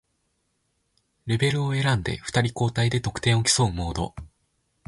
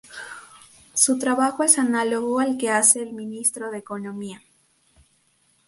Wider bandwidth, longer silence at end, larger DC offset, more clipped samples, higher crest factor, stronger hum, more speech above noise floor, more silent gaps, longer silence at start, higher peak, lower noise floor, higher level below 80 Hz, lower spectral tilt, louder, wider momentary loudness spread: about the same, 11.5 kHz vs 12 kHz; second, 0.6 s vs 1.3 s; neither; neither; second, 18 dB vs 24 dB; neither; first, 49 dB vs 42 dB; neither; first, 1.25 s vs 0.1 s; second, -8 dBFS vs 0 dBFS; first, -73 dBFS vs -64 dBFS; first, -44 dBFS vs -68 dBFS; first, -4.5 dB/octave vs -2 dB/octave; second, -24 LUFS vs -20 LUFS; second, 11 LU vs 20 LU